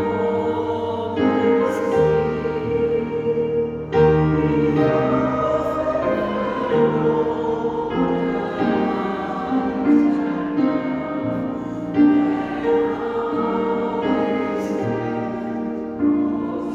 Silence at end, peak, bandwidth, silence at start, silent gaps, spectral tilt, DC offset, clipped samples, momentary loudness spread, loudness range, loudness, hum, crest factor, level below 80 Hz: 0 s; -4 dBFS; 7.4 kHz; 0 s; none; -8.5 dB/octave; under 0.1%; under 0.1%; 7 LU; 3 LU; -21 LUFS; none; 14 dB; -44 dBFS